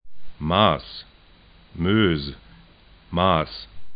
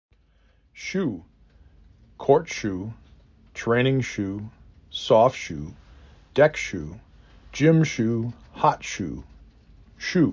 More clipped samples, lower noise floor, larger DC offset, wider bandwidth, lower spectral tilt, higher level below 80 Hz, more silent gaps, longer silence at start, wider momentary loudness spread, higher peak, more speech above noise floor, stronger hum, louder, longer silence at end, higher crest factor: neither; second, -52 dBFS vs -60 dBFS; neither; second, 5.2 kHz vs 7.6 kHz; first, -11 dB/octave vs -6 dB/octave; first, -44 dBFS vs -50 dBFS; neither; second, 0.05 s vs 0.75 s; about the same, 19 LU vs 19 LU; about the same, -2 dBFS vs -4 dBFS; second, 30 dB vs 38 dB; neither; about the same, -22 LUFS vs -24 LUFS; about the same, 0 s vs 0 s; about the same, 22 dB vs 20 dB